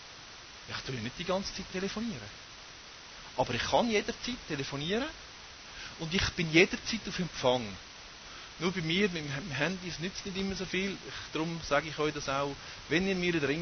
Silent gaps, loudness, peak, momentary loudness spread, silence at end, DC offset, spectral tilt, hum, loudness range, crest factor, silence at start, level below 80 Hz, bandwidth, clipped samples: none; -32 LUFS; -10 dBFS; 18 LU; 0 s; under 0.1%; -4.5 dB/octave; none; 4 LU; 24 dB; 0 s; -54 dBFS; 6.6 kHz; under 0.1%